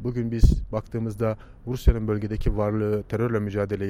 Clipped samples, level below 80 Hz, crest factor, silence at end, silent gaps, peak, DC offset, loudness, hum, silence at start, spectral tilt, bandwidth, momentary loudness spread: under 0.1%; -28 dBFS; 20 dB; 0 s; none; -2 dBFS; under 0.1%; -26 LUFS; none; 0 s; -8.5 dB/octave; 15 kHz; 8 LU